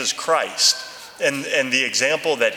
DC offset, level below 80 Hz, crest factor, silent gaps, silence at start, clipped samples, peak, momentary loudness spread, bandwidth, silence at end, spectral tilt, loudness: under 0.1%; -72 dBFS; 18 dB; none; 0 s; under 0.1%; -2 dBFS; 7 LU; 20 kHz; 0 s; -0.5 dB/octave; -19 LUFS